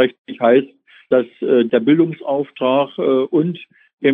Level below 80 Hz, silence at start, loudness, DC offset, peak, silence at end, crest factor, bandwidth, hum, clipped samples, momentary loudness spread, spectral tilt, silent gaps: -70 dBFS; 0 s; -17 LUFS; under 0.1%; 0 dBFS; 0 s; 16 dB; 3.9 kHz; none; under 0.1%; 7 LU; -9.5 dB/octave; 0.18-0.25 s, 3.93-3.98 s